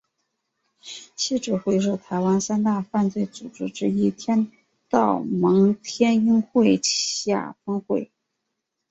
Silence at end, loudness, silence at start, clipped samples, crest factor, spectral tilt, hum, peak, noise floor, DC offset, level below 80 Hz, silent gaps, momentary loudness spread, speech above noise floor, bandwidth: 0.85 s; -22 LUFS; 0.85 s; under 0.1%; 18 dB; -5 dB/octave; none; -4 dBFS; -80 dBFS; under 0.1%; -64 dBFS; none; 12 LU; 58 dB; 8.2 kHz